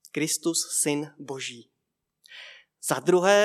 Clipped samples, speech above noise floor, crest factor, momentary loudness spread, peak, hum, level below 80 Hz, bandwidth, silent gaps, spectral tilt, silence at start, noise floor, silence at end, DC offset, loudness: under 0.1%; 57 dB; 20 dB; 22 LU; -6 dBFS; none; -88 dBFS; 16 kHz; none; -3 dB/octave; 0.15 s; -81 dBFS; 0 s; under 0.1%; -26 LUFS